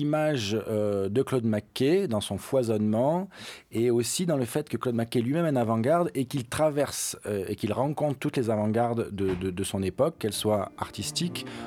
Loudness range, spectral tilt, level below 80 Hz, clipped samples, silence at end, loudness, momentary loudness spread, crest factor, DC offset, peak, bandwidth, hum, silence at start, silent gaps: 2 LU; -5.5 dB/octave; -60 dBFS; under 0.1%; 0 s; -28 LUFS; 6 LU; 16 dB; under 0.1%; -12 dBFS; 19 kHz; none; 0 s; none